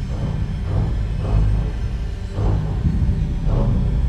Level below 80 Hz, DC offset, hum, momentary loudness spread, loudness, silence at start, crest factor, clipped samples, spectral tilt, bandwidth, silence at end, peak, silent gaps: -22 dBFS; under 0.1%; none; 6 LU; -22 LUFS; 0 s; 12 dB; under 0.1%; -8.5 dB/octave; 8.2 kHz; 0 s; -6 dBFS; none